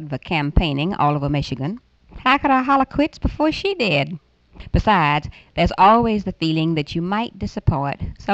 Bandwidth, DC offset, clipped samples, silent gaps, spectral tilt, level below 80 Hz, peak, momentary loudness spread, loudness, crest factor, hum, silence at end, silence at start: 8.2 kHz; under 0.1%; under 0.1%; none; -7 dB/octave; -32 dBFS; -2 dBFS; 11 LU; -19 LUFS; 18 dB; none; 0 s; 0 s